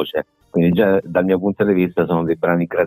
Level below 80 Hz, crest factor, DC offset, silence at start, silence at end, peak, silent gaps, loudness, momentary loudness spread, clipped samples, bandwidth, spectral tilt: -52 dBFS; 14 dB; under 0.1%; 0 s; 0 s; -2 dBFS; none; -18 LUFS; 6 LU; under 0.1%; 15.5 kHz; -10 dB/octave